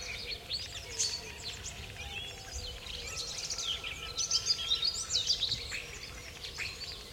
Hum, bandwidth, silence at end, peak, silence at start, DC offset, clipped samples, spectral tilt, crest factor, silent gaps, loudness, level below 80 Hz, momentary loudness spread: none; 16.5 kHz; 0 s; -18 dBFS; 0 s; under 0.1%; under 0.1%; 0 dB/octave; 20 dB; none; -34 LUFS; -52 dBFS; 13 LU